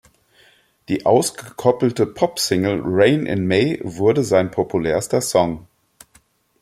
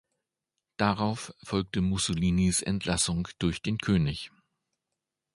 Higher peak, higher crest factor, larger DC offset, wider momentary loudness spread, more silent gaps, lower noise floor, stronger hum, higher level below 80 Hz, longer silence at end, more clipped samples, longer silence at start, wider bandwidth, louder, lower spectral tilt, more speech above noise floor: first, 0 dBFS vs -8 dBFS; about the same, 20 dB vs 22 dB; neither; about the same, 6 LU vs 8 LU; neither; second, -57 dBFS vs -86 dBFS; neither; second, -52 dBFS vs -46 dBFS; about the same, 1 s vs 1.05 s; neither; about the same, 0.9 s vs 0.8 s; first, 16 kHz vs 11.5 kHz; first, -19 LUFS vs -28 LUFS; about the same, -5 dB/octave vs -4.5 dB/octave; second, 39 dB vs 58 dB